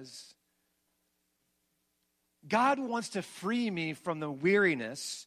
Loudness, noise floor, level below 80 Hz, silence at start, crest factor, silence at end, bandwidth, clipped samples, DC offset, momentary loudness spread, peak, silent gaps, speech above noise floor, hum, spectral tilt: -31 LUFS; -78 dBFS; -80 dBFS; 0 s; 20 dB; 0.05 s; 14.5 kHz; under 0.1%; under 0.1%; 11 LU; -14 dBFS; none; 47 dB; none; -4.5 dB/octave